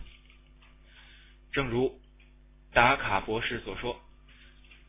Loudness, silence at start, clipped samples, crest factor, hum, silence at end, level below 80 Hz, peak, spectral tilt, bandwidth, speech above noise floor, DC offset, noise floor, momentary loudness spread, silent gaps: -28 LUFS; 0 s; under 0.1%; 26 dB; none; 0.15 s; -50 dBFS; -6 dBFS; -3 dB/octave; 3.9 kHz; 28 dB; under 0.1%; -56 dBFS; 13 LU; none